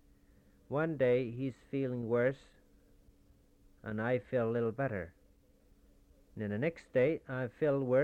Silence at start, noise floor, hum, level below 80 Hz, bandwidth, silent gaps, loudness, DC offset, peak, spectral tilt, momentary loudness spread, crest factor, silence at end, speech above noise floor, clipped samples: 0.7 s; -66 dBFS; none; -66 dBFS; 8.2 kHz; none; -35 LUFS; under 0.1%; -18 dBFS; -9 dB/octave; 12 LU; 16 dB; 0 s; 32 dB; under 0.1%